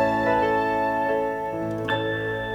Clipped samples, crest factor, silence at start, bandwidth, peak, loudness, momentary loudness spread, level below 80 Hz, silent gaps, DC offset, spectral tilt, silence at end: under 0.1%; 14 dB; 0 s; over 20 kHz; -10 dBFS; -24 LUFS; 7 LU; -50 dBFS; none; under 0.1%; -6.5 dB/octave; 0 s